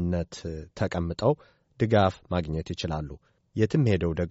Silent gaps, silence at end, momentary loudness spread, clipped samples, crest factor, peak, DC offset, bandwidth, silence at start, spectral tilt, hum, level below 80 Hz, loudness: none; 0 s; 13 LU; under 0.1%; 18 dB; -8 dBFS; under 0.1%; 8 kHz; 0 s; -6.5 dB/octave; none; -46 dBFS; -28 LUFS